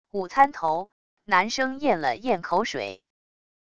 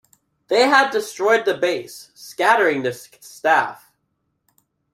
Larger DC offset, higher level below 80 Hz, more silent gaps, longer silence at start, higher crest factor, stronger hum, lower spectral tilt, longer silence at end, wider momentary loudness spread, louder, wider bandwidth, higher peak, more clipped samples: first, 0.4% vs under 0.1%; first, -62 dBFS vs -70 dBFS; first, 0.92-1.17 s vs none; second, 0.05 s vs 0.5 s; about the same, 20 dB vs 20 dB; neither; about the same, -4 dB/octave vs -3 dB/octave; second, 0.65 s vs 1.2 s; second, 10 LU vs 19 LU; second, -24 LUFS vs -18 LUFS; second, 9.6 kHz vs 16 kHz; second, -6 dBFS vs -2 dBFS; neither